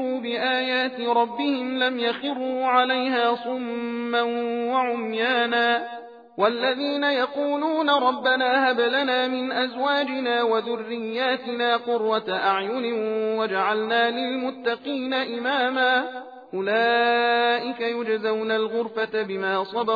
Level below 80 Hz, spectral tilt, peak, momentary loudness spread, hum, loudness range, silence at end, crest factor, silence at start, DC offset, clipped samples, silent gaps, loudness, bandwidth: -80 dBFS; -5.5 dB/octave; -6 dBFS; 7 LU; none; 2 LU; 0 s; 18 dB; 0 s; under 0.1%; under 0.1%; none; -23 LUFS; 5 kHz